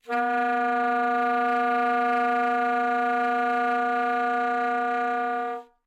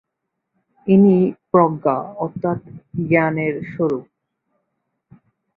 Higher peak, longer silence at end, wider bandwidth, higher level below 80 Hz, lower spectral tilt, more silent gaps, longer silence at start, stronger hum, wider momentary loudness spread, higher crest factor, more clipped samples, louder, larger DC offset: second, -16 dBFS vs -2 dBFS; second, 0.25 s vs 1.55 s; first, 8.4 kHz vs 3.9 kHz; second, -86 dBFS vs -58 dBFS; second, -3.5 dB/octave vs -11 dB/octave; neither; second, 0.05 s vs 0.85 s; neither; second, 3 LU vs 14 LU; second, 8 dB vs 18 dB; neither; second, -24 LUFS vs -18 LUFS; neither